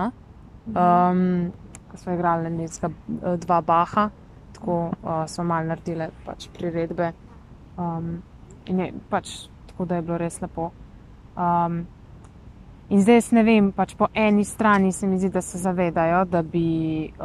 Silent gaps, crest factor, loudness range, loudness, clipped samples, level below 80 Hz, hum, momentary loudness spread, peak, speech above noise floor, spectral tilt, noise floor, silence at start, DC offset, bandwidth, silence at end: none; 18 dB; 10 LU; -23 LUFS; under 0.1%; -48 dBFS; none; 15 LU; -6 dBFS; 23 dB; -6.5 dB/octave; -45 dBFS; 0 s; under 0.1%; 13 kHz; 0 s